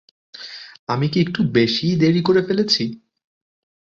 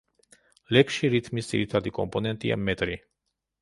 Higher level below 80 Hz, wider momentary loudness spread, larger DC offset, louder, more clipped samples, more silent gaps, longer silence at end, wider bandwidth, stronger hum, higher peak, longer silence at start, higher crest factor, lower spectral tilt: about the same, -56 dBFS vs -52 dBFS; first, 17 LU vs 8 LU; neither; first, -18 LUFS vs -26 LUFS; neither; first, 0.79-0.87 s vs none; first, 1 s vs 0.65 s; second, 7.6 kHz vs 11.5 kHz; neither; about the same, -4 dBFS vs -4 dBFS; second, 0.35 s vs 0.7 s; about the same, 18 dB vs 22 dB; about the same, -6 dB/octave vs -5.5 dB/octave